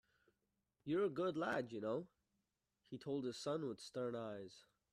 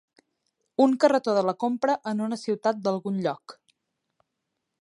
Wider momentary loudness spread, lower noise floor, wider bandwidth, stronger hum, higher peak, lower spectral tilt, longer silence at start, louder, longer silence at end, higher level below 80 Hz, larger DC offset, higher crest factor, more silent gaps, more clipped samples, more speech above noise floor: first, 15 LU vs 9 LU; first, -88 dBFS vs -82 dBFS; first, 13 kHz vs 11.5 kHz; neither; second, -28 dBFS vs -6 dBFS; about the same, -6 dB/octave vs -6 dB/octave; about the same, 0.85 s vs 0.8 s; second, -44 LUFS vs -25 LUFS; second, 0.3 s vs 1.3 s; about the same, -82 dBFS vs -78 dBFS; neither; about the same, 18 dB vs 22 dB; neither; neither; second, 45 dB vs 57 dB